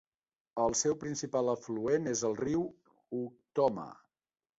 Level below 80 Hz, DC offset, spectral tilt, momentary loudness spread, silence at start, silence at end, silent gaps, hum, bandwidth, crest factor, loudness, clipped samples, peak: -66 dBFS; under 0.1%; -4.5 dB/octave; 11 LU; 0.55 s; 0.65 s; none; none; 8.2 kHz; 18 dB; -33 LUFS; under 0.1%; -16 dBFS